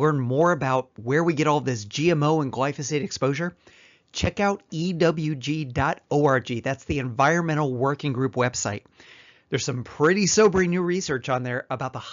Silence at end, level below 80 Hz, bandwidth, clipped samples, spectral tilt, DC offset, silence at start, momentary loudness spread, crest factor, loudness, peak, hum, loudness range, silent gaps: 0 s; -50 dBFS; 7.6 kHz; under 0.1%; -5 dB/octave; under 0.1%; 0 s; 8 LU; 16 dB; -24 LUFS; -8 dBFS; none; 2 LU; none